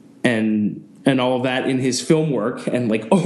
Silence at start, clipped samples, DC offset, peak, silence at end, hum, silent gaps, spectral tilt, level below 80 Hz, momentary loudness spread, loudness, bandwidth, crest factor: 0.25 s; under 0.1%; under 0.1%; -2 dBFS; 0 s; none; none; -5.5 dB/octave; -66 dBFS; 5 LU; -20 LUFS; 12 kHz; 18 dB